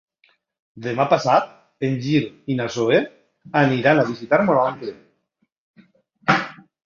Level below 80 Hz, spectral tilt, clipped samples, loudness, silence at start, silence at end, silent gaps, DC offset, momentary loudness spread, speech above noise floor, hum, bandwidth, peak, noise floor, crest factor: -60 dBFS; -6.5 dB/octave; under 0.1%; -20 LUFS; 0.75 s; 0.3 s; 5.52-5.74 s; under 0.1%; 16 LU; 51 dB; none; 7.4 kHz; -2 dBFS; -71 dBFS; 20 dB